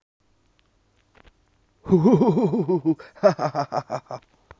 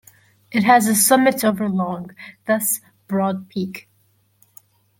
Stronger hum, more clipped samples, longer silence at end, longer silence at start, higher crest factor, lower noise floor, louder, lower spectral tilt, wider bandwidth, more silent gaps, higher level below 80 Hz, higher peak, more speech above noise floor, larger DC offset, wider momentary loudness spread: neither; neither; second, 0.4 s vs 1.2 s; first, 1.85 s vs 0.5 s; about the same, 20 dB vs 20 dB; about the same, -64 dBFS vs -61 dBFS; second, -22 LUFS vs -18 LUFS; first, -8.5 dB/octave vs -4 dB/octave; second, 7.4 kHz vs 17 kHz; neither; first, -56 dBFS vs -66 dBFS; about the same, -4 dBFS vs -2 dBFS; about the same, 43 dB vs 43 dB; neither; about the same, 18 LU vs 17 LU